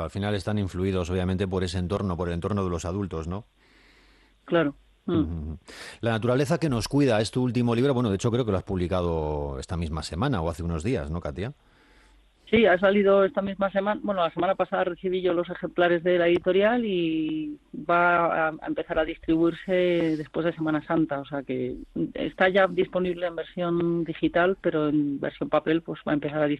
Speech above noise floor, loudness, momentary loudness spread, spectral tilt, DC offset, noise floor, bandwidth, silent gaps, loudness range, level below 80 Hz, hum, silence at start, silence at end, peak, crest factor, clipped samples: 33 dB; -26 LUFS; 10 LU; -6.5 dB/octave; under 0.1%; -58 dBFS; 12.5 kHz; none; 6 LU; -48 dBFS; none; 0 s; 0 s; -6 dBFS; 20 dB; under 0.1%